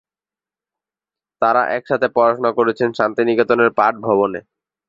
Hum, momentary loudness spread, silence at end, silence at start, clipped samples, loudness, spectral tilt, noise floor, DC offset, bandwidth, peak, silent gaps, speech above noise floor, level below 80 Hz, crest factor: none; 4 LU; 0.5 s; 1.4 s; under 0.1%; -17 LUFS; -7 dB/octave; under -90 dBFS; under 0.1%; 7.4 kHz; 0 dBFS; none; over 74 dB; -62 dBFS; 18 dB